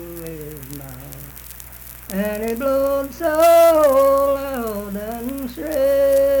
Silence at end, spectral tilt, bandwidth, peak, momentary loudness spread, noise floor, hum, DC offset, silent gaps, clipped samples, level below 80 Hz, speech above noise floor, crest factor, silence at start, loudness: 0 s; -5 dB/octave; 19.5 kHz; -4 dBFS; 22 LU; -38 dBFS; none; under 0.1%; none; under 0.1%; -42 dBFS; 19 dB; 14 dB; 0 s; -18 LUFS